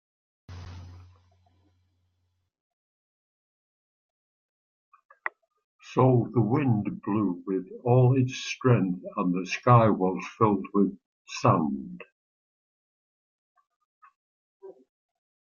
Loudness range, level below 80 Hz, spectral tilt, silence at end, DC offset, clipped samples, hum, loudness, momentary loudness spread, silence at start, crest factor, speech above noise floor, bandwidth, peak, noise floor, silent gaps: 13 LU; -66 dBFS; -7.5 dB/octave; 0.75 s; under 0.1%; under 0.1%; none; -25 LUFS; 18 LU; 0.5 s; 24 dB; 52 dB; 7.2 kHz; -6 dBFS; -76 dBFS; 2.60-4.92 s, 5.05-5.09 s, 5.64-5.79 s, 11.06-11.25 s, 12.12-13.55 s, 13.76-14.01 s, 14.16-14.60 s